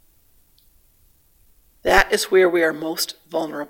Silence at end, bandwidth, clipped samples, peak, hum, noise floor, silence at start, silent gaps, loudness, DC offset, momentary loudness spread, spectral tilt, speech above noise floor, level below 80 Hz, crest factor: 0.05 s; 17 kHz; under 0.1%; 0 dBFS; none; -57 dBFS; 1.85 s; none; -19 LUFS; under 0.1%; 11 LU; -3 dB/octave; 38 dB; -42 dBFS; 22 dB